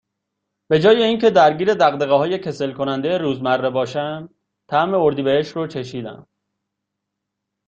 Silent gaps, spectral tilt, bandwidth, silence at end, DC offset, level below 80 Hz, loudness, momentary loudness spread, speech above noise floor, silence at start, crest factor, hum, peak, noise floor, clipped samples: none; -6 dB/octave; 7.6 kHz; 1.45 s; under 0.1%; -60 dBFS; -18 LUFS; 13 LU; 62 dB; 0.7 s; 18 dB; none; -2 dBFS; -80 dBFS; under 0.1%